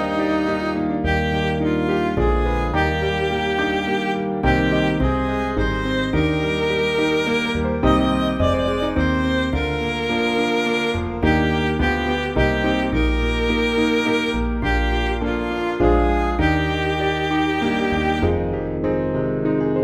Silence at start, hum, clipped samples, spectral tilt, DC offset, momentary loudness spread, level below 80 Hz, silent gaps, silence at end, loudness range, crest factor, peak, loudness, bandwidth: 0 s; none; under 0.1%; -6.5 dB/octave; under 0.1%; 4 LU; -28 dBFS; none; 0 s; 1 LU; 16 dB; -4 dBFS; -20 LUFS; 13.5 kHz